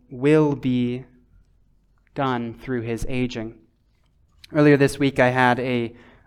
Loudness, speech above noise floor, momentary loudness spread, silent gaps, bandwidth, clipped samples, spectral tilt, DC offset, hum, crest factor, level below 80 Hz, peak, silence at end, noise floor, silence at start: -21 LUFS; 41 dB; 14 LU; none; 13.5 kHz; under 0.1%; -7 dB/octave; under 0.1%; none; 18 dB; -46 dBFS; -4 dBFS; 0.35 s; -62 dBFS; 0.1 s